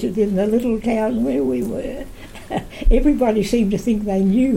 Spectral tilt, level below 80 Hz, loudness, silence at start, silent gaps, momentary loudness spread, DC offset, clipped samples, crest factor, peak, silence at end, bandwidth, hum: -7 dB/octave; -26 dBFS; -19 LUFS; 0 s; none; 11 LU; under 0.1%; under 0.1%; 14 dB; -4 dBFS; 0 s; 16 kHz; none